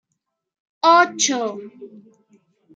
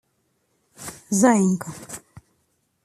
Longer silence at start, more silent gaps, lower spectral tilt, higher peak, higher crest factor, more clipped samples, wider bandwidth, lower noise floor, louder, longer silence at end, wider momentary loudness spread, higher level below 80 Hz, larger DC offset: about the same, 0.85 s vs 0.8 s; neither; second, -1 dB/octave vs -5.5 dB/octave; about the same, -2 dBFS vs -4 dBFS; about the same, 20 dB vs 22 dB; neither; second, 9.6 kHz vs 14.5 kHz; first, -77 dBFS vs -70 dBFS; first, -17 LUFS vs -20 LUFS; about the same, 0.9 s vs 0.85 s; about the same, 21 LU vs 21 LU; second, -82 dBFS vs -62 dBFS; neither